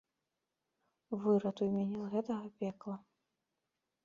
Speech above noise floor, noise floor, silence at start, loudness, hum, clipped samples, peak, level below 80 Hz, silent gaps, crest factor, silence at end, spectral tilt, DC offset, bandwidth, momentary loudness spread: 52 dB; -88 dBFS; 1.1 s; -37 LUFS; none; under 0.1%; -20 dBFS; -78 dBFS; none; 20 dB; 1.05 s; -8.5 dB/octave; under 0.1%; 7.2 kHz; 13 LU